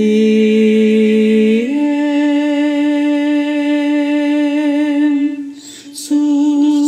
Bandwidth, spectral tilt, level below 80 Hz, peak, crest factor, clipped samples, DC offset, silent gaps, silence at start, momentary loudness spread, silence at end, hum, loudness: 10.5 kHz; -6 dB/octave; -72 dBFS; -2 dBFS; 10 dB; under 0.1%; under 0.1%; none; 0 s; 7 LU; 0 s; none; -13 LUFS